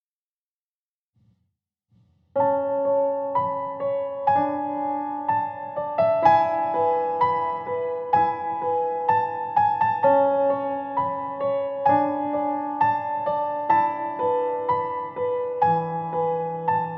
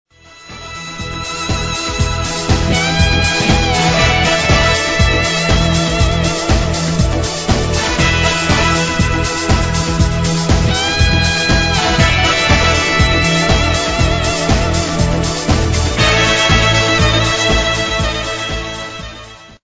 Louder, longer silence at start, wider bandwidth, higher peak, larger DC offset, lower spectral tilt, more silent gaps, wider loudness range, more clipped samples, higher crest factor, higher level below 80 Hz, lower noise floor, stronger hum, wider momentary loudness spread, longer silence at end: second, -23 LUFS vs -13 LUFS; first, 2.35 s vs 0.4 s; second, 5.8 kHz vs 8 kHz; second, -6 dBFS vs 0 dBFS; neither; first, -8.5 dB/octave vs -4 dB/octave; neither; about the same, 3 LU vs 2 LU; neither; about the same, 18 dB vs 14 dB; second, -70 dBFS vs -20 dBFS; first, under -90 dBFS vs -36 dBFS; neither; about the same, 8 LU vs 8 LU; about the same, 0 s vs 0.1 s